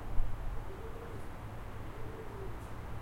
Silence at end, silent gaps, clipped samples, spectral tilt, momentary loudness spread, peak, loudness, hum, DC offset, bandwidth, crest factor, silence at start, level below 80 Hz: 0 s; none; under 0.1%; -7 dB/octave; 4 LU; -16 dBFS; -45 LUFS; none; under 0.1%; 12.5 kHz; 20 dB; 0 s; -42 dBFS